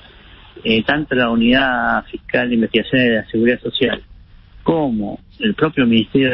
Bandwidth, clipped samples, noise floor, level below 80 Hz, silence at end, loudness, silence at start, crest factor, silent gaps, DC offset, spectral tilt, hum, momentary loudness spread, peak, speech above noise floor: 5.6 kHz; under 0.1%; -42 dBFS; -42 dBFS; 0 s; -17 LUFS; 0.55 s; 16 dB; none; under 0.1%; -10.5 dB/octave; none; 8 LU; 0 dBFS; 26 dB